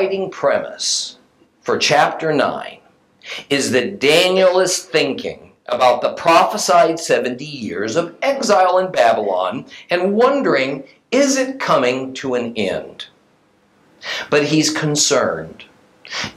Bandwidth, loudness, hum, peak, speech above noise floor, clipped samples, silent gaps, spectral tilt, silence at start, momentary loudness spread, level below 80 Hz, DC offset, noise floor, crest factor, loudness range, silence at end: 16 kHz; -16 LUFS; none; 0 dBFS; 40 dB; under 0.1%; none; -3 dB/octave; 0 s; 15 LU; -64 dBFS; under 0.1%; -56 dBFS; 18 dB; 4 LU; 0.05 s